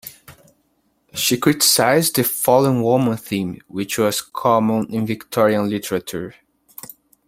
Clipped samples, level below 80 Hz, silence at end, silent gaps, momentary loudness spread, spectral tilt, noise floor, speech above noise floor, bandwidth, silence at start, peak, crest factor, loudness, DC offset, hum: under 0.1%; -58 dBFS; 0.95 s; none; 18 LU; -4 dB/octave; -65 dBFS; 46 dB; 16.5 kHz; 0.05 s; -2 dBFS; 18 dB; -18 LUFS; under 0.1%; none